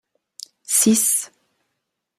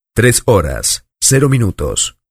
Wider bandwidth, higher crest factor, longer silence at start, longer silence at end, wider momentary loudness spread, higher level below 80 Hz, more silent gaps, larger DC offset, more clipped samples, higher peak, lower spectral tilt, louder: about the same, 15.5 kHz vs 15.5 kHz; first, 20 dB vs 14 dB; first, 0.7 s vs 0.15 s; first, 0.9 s vs 0.2 s; first, 24 LU vs 6 LU; second, -68 dBFS vs -30 dBFS; neither; neither; neither; second, -4 dBFS vs 0 dBFS; second, -2.5 dB/octave vs -4 dB/octave; second, -17 LUFS vs -13 LUFS